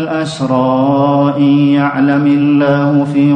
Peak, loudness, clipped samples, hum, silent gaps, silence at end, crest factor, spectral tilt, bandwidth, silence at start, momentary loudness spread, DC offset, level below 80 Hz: 0 dBFS; -11 LUFS; under 0.1%; none; none; 0 s; 10 dB; -8 dB/octave; 9 kHz; 0 s; 3 LU; under 0.1%; -52 dBFS